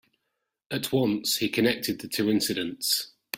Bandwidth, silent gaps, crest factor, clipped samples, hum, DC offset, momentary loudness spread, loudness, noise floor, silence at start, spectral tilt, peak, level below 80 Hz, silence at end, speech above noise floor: 16.5 kHz; none; 20 dB; under 0.1%; none; under 0.1%; 5 LU; -26 LUFS; -81 dBFS; 0.7 s; -3.5 dB/octave; -8 dBFS; -64 dBFS; 0 s; 54 dB